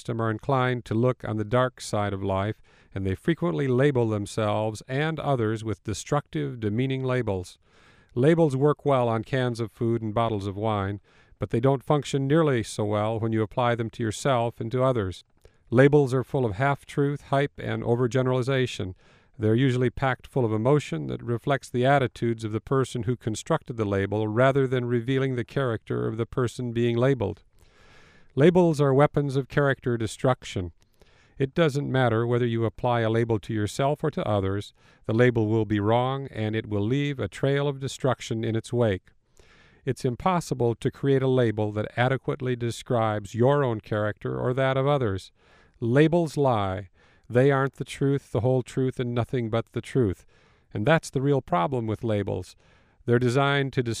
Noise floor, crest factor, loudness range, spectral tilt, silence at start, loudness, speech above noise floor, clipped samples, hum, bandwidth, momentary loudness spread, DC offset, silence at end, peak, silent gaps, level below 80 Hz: -58 dBFS; 22 dB; 3 LU; -7 dB/octave; 0.05 s; -25 LUFS; 33 dB; under 0.1%; none; 12.5 kHz; 9 LU; under 0.1%; 0 s; -4 dBFS; none; -54 dBFS